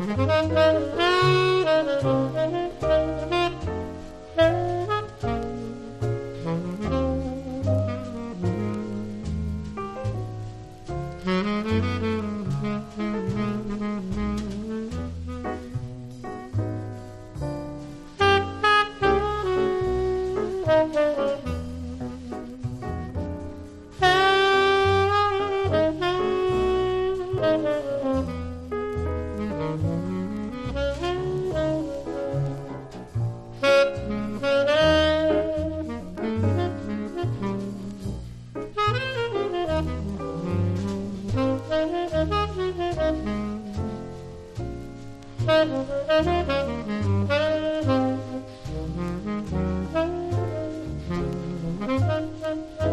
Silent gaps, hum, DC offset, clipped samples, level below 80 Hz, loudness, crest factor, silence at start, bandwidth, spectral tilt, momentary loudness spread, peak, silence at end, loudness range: none; none; under 0.1%; under 0.1%; -40 dBFS; -25 LUFS; 18 dB; 0 s; 12.5 kHz; -6.5 dB/octave; 14 LU; -6 dBFS; 0 s; 7 LU